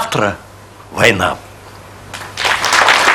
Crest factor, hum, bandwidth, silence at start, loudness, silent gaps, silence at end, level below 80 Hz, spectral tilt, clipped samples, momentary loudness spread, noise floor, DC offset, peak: 16 dB; none; over 20 kHz; 0 s; -13 LUFS; none; 0 s; -46 dBFS; -2.5 dB/octave; 0.2%; 20 LU; -35 dBFS; under 0.1%; 0 dBFS